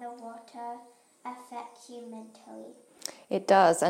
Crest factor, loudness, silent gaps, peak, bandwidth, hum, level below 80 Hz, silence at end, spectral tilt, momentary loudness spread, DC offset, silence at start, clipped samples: 22 dB; -29 LUFS; none; -8 dBFS; 16 kHz; none; -80 dBFS; 0 s; -4 dB/octave; 24 LU; under 0.1%; 0 s; under 0.1%